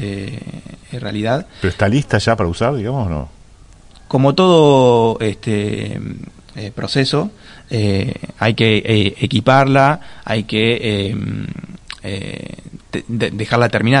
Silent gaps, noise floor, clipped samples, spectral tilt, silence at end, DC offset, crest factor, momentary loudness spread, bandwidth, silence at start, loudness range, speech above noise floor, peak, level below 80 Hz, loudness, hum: none; -42 dBFS; under 0.1%; -6.5 dB/octave; 0 s; under 0.1%; 16 dB; 19 LU; 11 kHz; 0 s; 6 LU; 27 dB; 0 dBFS; -42 dBFS; -16 LUFS; none